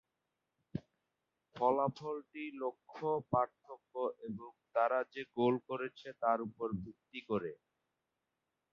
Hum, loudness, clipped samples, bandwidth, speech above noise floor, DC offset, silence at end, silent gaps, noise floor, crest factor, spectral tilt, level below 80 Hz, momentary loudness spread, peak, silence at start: none; -38 LUFS; under 0.1%; 7 kHz; 50 dB; under 0.1%; 1.2 s; none; -88 dBFS; 22 dB; -5.5 dB/octave; -72 dBFS; 14 LU; -18 dBFS; 0.75 s